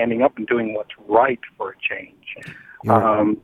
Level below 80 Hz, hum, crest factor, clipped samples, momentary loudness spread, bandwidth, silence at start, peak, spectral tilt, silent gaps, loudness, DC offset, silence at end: -58 dBFS; none; 20 dB; under 0.1%; 18 LU; 13.5 kHz; 0 s; -2 dBFS; -8 dB/octave; none; -20 LUFS; under 0.1%; 0.05 s